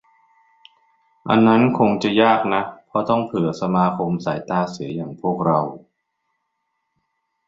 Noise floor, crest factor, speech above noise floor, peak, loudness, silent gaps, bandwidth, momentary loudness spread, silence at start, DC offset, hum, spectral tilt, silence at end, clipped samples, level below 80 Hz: -74 dBFS; 18 dB; 56 dB; -2 dBFS; -19 LUFS; none; 7.6 kHz; 11 LU; 1.25 s; under 0.1%; none; -7.5 dB/octave; 1.7 s; under 0.1%; -58 dBFS